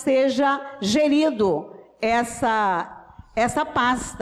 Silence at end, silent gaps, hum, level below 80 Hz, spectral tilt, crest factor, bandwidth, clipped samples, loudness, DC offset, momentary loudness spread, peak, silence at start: 0 s; none; none; -50 dBFS; -4 dB/octave; 10 dB; 13.5 kHz; under 0.1%; -22 LUFS; under 0.1%; 9 LU; -12 dBFS; 0 s